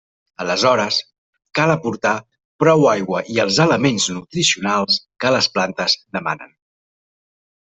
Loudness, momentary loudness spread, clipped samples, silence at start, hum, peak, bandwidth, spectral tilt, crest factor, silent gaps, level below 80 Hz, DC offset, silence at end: -18 LUFS; 9 LU; under 0.1%; 0.4 s; none; -2 dBFS; 8.4 kHz; -3.5 dB/octave; 18 dB; 1.18-1.33 s, 2.45-2.59 s; -58 dBFS; under 0.1%; 1.2 s